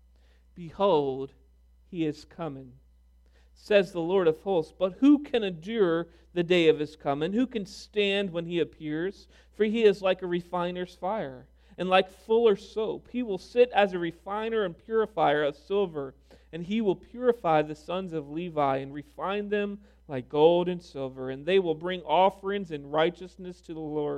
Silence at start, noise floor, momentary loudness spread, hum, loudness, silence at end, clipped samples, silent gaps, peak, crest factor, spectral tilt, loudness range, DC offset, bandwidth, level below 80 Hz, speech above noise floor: 0.55 s; -59 dBFS; 15 LU; none; -28 LUFS; 0 s; under 0.1%; none; -8 dBFS; 20 dB; -6.5 dB/octave; 4 LU; under 0.1%; 10.5 kHz; -58 dBFS; 32 dB